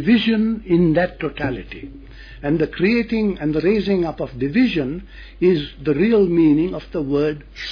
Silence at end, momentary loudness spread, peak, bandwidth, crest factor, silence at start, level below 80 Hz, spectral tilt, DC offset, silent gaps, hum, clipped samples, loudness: 0 s; 12 LU; -6 dBFS; 5.4 kHz; 14 dB; 0 s; -40 dBFS; -8.5 dB/octave; under 0.1%; none; none; under 0.1%; -19 LUFS